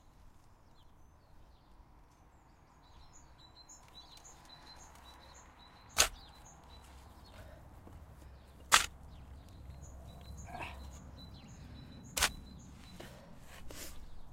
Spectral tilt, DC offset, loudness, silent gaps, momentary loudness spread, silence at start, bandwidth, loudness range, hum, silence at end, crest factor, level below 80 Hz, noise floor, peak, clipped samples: -0.5 dB/octave; under 0.1%; -34 LUFS; none; 26 LU; 0.05 s; 16 kHz; 20 LU; none; 0 s; 38 dB; -56 dBFS; -62 dBFS; -6 dBFS; under 0.1%